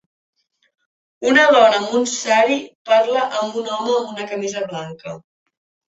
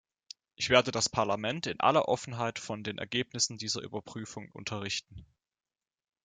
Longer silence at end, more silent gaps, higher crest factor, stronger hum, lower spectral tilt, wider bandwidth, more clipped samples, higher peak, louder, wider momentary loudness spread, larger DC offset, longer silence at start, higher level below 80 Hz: second, 0.75 s vs 1 s; first, 2.75-2.85 s vs none; second, 18 dB vs 26 dB; neither; about the same, -2.5 dB/octave vs -3 dB/octave; second, 8.2 kHz vs 9.6 kHz; neither; first, 0 dBFS vs -6 dBFS; first, -17 LUFS vs -31 LUFS; about the same, 17 LU vs 16 LU; neither; first, 1.2 s vs 0.6 s; about the same, -68 dBFS vs -64 dBFS